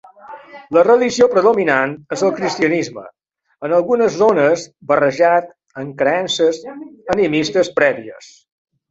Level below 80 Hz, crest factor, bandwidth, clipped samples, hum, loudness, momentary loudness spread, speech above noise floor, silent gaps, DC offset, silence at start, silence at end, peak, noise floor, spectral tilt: -58 dBFS; 16 dB; 8 kHz; under 0.1%; none; -15 LUFS; 18 LU; 22 dB; none; under 0.1%; 0.25 s; 0.7 s; 0 dBFS; -38 dBFS; -4.5 dB/octave